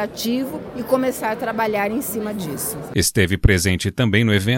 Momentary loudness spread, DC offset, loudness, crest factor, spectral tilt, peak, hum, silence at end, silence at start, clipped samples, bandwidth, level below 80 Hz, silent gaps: 9 LU; under 0.1%; -20 LUFS; 20 dB; -4.5 dB/octave; 0 dBFS; none; 0 s; 0 s; under 0.1%; 17 kHz; -32 dBFS; none